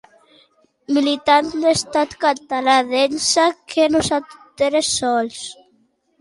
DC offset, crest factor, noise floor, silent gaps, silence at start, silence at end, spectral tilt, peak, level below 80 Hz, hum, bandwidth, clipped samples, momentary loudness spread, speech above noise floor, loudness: under 0.1%; 16 dB; -61 dBFS; none; 0.9 s; 0.7 s; -2.5 dB/octave; -2 dBFS; -54 dBFS; none; 11.5 kHz; under 0.1%; 6 LU; 44 dB; -18 LUFS